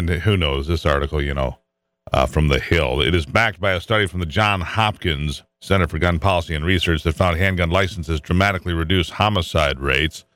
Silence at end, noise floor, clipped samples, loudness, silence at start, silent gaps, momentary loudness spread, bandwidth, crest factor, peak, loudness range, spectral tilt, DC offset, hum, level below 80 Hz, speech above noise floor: 0.15 s; -46 dBFS; under 0.1%; -19 LUFS; 0 s; none; 5 LU; 15.5 kHz; 16 dB; -2 dBFS; 1 LU; -5.5 dB/octave; under 0.1%; none; -30 dBFS; 27 dB